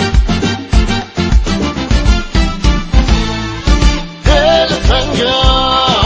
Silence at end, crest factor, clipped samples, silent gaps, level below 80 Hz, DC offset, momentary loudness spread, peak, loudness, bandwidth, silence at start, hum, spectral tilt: 0 s; 10 dB; 0.4%; none; -14 dBFS; under 0.1%; 6 LU; 0 dBFS; -12 LUFS; 8 kHz; 0 s; none; -5 dB/octave